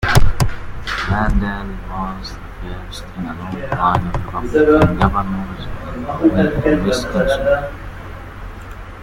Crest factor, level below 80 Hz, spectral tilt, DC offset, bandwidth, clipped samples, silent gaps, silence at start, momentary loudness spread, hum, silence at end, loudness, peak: 16 dB; -26 dBFS; -6.5 dB/octave; under 0.1%; 16.5 kHz; under 0.1%; none; 0 s; 18 LU; none; 0 s; -18 LUFS; 0 dBFS